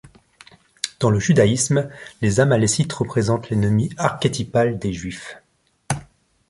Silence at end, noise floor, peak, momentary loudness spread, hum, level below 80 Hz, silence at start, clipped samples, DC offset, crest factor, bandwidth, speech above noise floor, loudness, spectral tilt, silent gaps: 0.45 s; -50 dBFS; 0 dBFS; 13 LU; none; -46 dBFS; 0.85 s; under 0.1%; under 0.1%; 20 dB; 11.5 kHz; 31 dB; -20 LUFS; -5.5 dB/octave; none